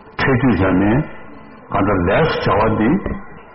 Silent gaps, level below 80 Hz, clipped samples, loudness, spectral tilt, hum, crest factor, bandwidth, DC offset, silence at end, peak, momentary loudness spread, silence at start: none; -34 dBFS; under 0.1%; -16 LUFS; -6 dB/octave; none; 12 dB; 5.8 kHz; under 0.1%; 0.1 s; -6 dBFS; 10 LU; 0.05 s